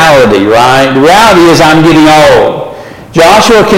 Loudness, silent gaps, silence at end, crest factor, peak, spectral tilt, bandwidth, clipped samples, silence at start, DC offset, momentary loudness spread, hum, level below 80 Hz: -3 LUFS; none; 0 s; 4 dB; 0 dBFS; -4.5 dB/octave; 17 kHz; 1%; 0 s; under 0.1%; 8 LU; none; -30 dBFS